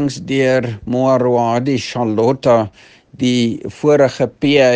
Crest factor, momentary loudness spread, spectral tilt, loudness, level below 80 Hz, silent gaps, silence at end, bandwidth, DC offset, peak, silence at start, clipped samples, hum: 14 dB; 6 LU; -6 dB/octave; -15 LUFS; -52 dBFS; none; 0 s; 9.6 kHz; under 0.1%; 0 dBFS; 0 s; under 0.1%; none